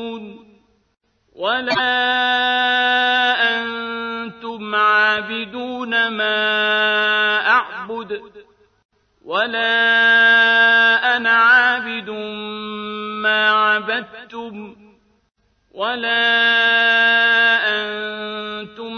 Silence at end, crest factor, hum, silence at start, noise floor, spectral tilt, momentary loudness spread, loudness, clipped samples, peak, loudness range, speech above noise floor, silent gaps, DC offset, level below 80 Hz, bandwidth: 0 s; 16 dB; none; 0 s; -53 dBFS; -3.5 dB/octave; 16 LU; -15 LUFS; under 0.1%; -2 dBFS; 7 LU; 34 dB; 8.85-8.89 s; under 0.1%; -66 dBFS; 6.6 kHz